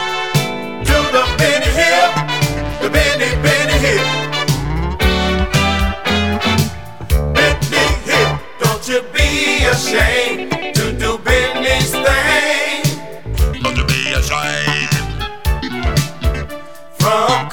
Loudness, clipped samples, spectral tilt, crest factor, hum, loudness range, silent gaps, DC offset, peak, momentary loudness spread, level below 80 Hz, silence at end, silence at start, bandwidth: -15 LUFS; under 0.1%; -4 dB/octave; 16 dB; none; 4 LU; none; 2%; 0 dBFS; 7 LU; -24 dBFS; 0 s; 0 s; over 20 kHz